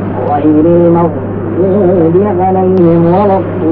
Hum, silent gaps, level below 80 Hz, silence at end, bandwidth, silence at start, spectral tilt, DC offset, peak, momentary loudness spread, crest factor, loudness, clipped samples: none; none; -40 dBFS; 0 s; 4.2 kHz; 0 s; -13 dB/octave; under 0.1%; 0 dBFS; 6 LU; 8 dB; -9 LUFS; under 0.1%